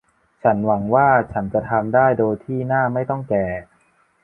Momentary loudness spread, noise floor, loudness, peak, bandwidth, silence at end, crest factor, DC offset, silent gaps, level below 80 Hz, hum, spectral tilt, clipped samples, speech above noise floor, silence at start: 8 LU; -60 dBFS; -19 LUFS; -2 dBFS; 3.1 kHz; 0.6 s; 18 dB; under 0.1%; none; -48 dBFS; none; -11 dB/octave; under 0.1%; 41 dB; 0.45 s